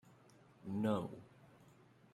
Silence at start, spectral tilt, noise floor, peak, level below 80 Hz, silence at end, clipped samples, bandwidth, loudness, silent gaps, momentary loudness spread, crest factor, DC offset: 0.05 s; -8 dB/octave; -66 dBFS; -22 dBFS; -80 dBFS; 0.45 s; under 0.1%; 12.5 kHz; -41 LUFS; none; 25 LU; 22 dB; under 0.1%